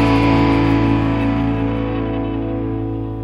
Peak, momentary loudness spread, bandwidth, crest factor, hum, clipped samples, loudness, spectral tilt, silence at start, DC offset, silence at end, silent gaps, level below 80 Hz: -2 dBFS; 8 LU; 7.8 kHz; 14 dB; none; under 0.1%; -18 LUFS; -8.5 dB/octave; 0 s; under 0.1%; 0 s; none; -28 dBFS